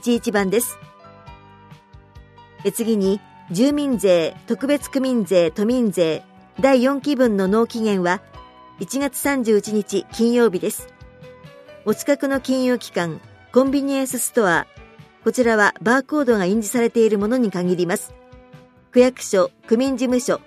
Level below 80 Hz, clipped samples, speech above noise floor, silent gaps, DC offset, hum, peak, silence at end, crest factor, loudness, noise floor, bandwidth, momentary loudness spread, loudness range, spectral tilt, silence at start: -52 dBFS; under 0.1%; 28 dB; none; under 0.1%; none; -2 dBFS; 0.1 s; 18 dB; -19 LUFS; -47 dBFS; 15.5 kHz; 9 LU; 4 LU; -5 dB/octave; 0.05 s